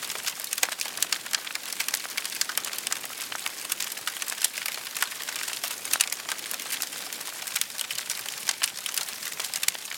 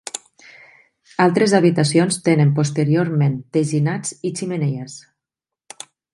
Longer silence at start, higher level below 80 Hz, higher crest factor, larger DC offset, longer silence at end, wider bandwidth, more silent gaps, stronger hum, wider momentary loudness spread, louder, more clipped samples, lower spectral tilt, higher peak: second, 0 s vs 0.15 s; second, -82 dBFS vs -64 dBFS; first, 32 dB vs 18 dB; neither; second, 0 s vs 1.15 s; first, over 20 kHz vs 11.5 kHz; neither; neither; second, 5 LU vs 19 LU; second, -29 LUFS vs -18 LUFS; neither; second, 2.5 dB/octave vs -6 dB/octave; about the same, 0 dBFS vs 0 dBFS